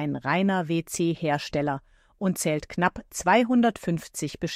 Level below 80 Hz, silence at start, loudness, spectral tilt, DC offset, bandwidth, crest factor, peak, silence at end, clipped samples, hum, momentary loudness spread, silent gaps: -54 dBFS; 0 s; -26 LUFS; -5 dB/octave; under 0.1%; 16 kHz; 18 dB; -8 dBFS; 0 s; under 0.1%; none; 9 LU; none